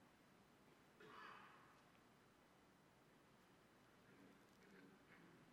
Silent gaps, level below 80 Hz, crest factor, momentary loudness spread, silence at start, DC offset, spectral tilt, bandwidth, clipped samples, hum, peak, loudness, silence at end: none; under -90 dBFS; 20 dB; 8 LU; 0 s; under 0.1%; -4.5 dB/octave; 15.5 kHz; under 0.1%; none; -48 dBFS; -65 LUFS; 0 s